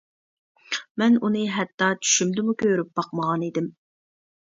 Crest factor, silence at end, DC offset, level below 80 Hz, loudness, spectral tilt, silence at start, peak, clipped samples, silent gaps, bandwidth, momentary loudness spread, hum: 18 dB; 0.8 s; under 0.1%; -70 dBFS; -23 LUFS; -3.5 dB/octave; 0.7 s; -6 dBFS; under 0.1%; 0.90-0.95 s, 1.74-1.78 s; 7.8 kHz; 10 LU; none